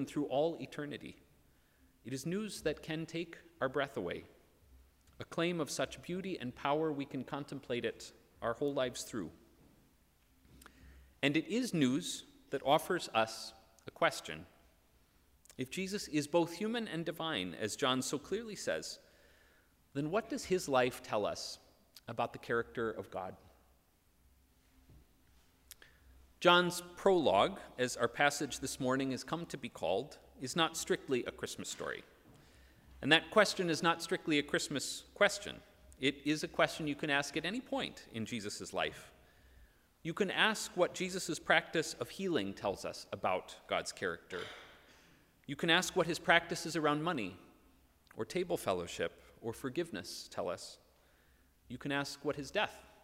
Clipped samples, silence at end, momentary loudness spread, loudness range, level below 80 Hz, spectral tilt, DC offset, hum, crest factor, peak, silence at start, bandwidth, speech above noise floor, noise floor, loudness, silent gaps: under 0.1%; 0.2 s; 15 LU; 8 LU; -68 dBFS; -4 dB/octave; under 0.1%; none; 26 dB; -10 dBFS; 0 s; 16 kHz; 35 dB; -71 dBFS; -36 LUFS; none